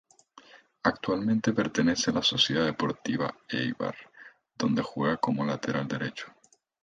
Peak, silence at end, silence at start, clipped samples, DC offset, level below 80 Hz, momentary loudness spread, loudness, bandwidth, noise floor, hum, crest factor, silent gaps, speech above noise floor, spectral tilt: -8 dBFS; 0.55 s; 0.55 s; under 0.1%; under 0.1%; -62 dBFS; 10 LU; -28 LUFS; 9.4 kHz; -56 dBFS; none; 22 dB; none; 28 dB; -4.5 dB/octave